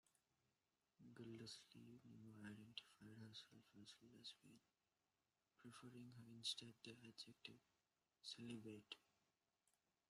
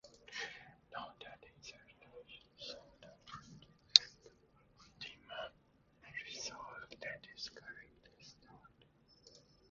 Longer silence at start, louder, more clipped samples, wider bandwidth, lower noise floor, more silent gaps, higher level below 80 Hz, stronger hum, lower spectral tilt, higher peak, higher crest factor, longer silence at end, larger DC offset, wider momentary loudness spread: about the same, 0.05 s vs 0.05 s; second, -59 LUFS vs -37 LUFS; neither; first, 13.5 kHz vs 7.2 kHz; first, under -90 dBFS vs -71 dBFS; neither; second, under -90 dBFS vs -76 dBFS; neither; first, -3.5 dB/octave vs 1.5 dB/octave; second, -34 dBFS vs 0 dBFS; second, 28 dB vs 44 dB; first, 1.05 s vs 0.3 s; neither; second, 13 LU vs 24 LU